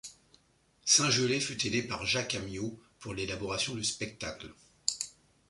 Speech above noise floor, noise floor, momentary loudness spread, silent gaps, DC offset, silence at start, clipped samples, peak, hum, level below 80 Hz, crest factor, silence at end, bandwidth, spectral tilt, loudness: 36 dB; -68 dBFS; 17 LU; none; under 0.1%; 0.05 s; under 0.1%; -8 dBFS; none; -60 dBFS; 26 dB; 0.4 s; 11.5 kHz; -2 dB/octave; -31 LUFS